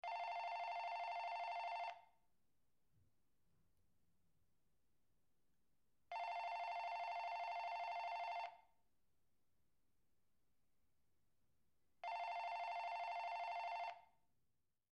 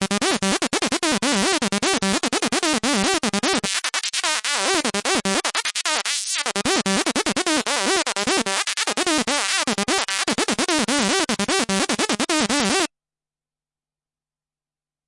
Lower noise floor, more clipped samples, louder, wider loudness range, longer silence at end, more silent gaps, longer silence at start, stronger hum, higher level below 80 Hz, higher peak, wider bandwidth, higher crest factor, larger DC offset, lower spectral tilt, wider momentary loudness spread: about the same, -88 dBFS vs under -90 dBFS; neither; second, -47 LUFS vs -20 LUFS; first, 9 LU vs 1 LU; second, 0.85 s vs 2.2 s; neither; about the same, 0.05 s vs 0 s; neither; second, under -90 dBFS vs -54 dBFS; second, -36 dBFS vs -2 dBFS; second, 9.4 kHz vs 11.5 kHz; second, 14 dB vs 20 dB; neither; second, -0.5 dB/octave vs -2 dB/octave; about the same, 4 LU vs 2 LU